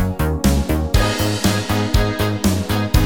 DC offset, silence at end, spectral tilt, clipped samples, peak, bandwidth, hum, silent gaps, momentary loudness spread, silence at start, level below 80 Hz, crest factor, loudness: 0.9%; 0 s; -5 dB/octave; under 0.1%; -2 dBFS; 19 kHz; none; none; 2 LU; 0 s; -22 dBFS; 16 dB; -18 LUFS